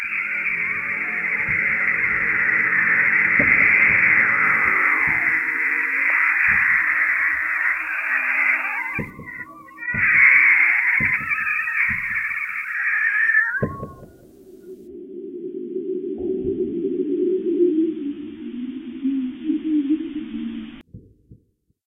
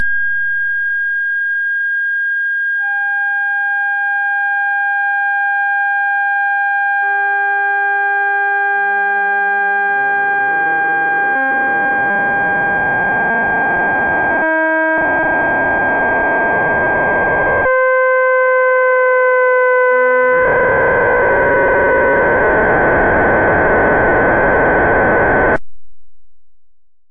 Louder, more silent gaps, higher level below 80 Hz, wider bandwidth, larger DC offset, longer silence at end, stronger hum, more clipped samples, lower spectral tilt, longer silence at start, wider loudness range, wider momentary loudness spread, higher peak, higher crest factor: second, -18 LUFS vs -13 LUFS; neither; second, -52 dBFS vs -36 dBFS; first, 16 kHz vs 4 kHz; neither; first, 0.5 s vs 0.25 s; neither; neither; second, -7 dB/octave vs -9 dB/octave; about the same, 0 s vs 0 s; first, 11 LU vs 3 LU; first, 18 LU vs 3 LU; about the same, -2 dBFS vs -2 dBFS; first, 18 dB vs 10 dB